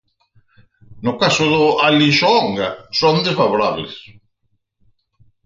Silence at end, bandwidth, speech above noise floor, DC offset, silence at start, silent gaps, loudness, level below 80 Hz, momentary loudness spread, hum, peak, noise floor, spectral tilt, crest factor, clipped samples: 1.45 s; 7.6 kHz; 51 dB; under 0.1%; 0.9 s; none; -15 LUFS; -56 dBFS; 12 LU; none; -2 dBFS; -67 dBFS; -4.5 dB/octave; 16 dB; under 0.1%